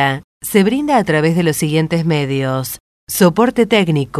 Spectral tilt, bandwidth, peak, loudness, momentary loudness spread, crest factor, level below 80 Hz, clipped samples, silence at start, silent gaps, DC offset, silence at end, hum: -5.5 dB/octave; 13.5 kHz; 0 dBFS; -15 LUFS; 10 LU; 14 dB; -48 dBFS; under 0.1%; 0 s; 0.24-0.40 s, 2.80-3.07 s; under 0.1%; 0 s; none